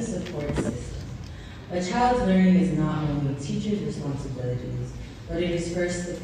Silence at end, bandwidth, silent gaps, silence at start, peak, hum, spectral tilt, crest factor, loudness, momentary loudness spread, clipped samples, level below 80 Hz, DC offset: 0 s; 10 kHz; none; 0 s; -10 dBFS; none; -6.5 dB/octave; 16 dB; -26 LUFS; 16 LU; under 0.1%; -42 dBFS; under 0.1%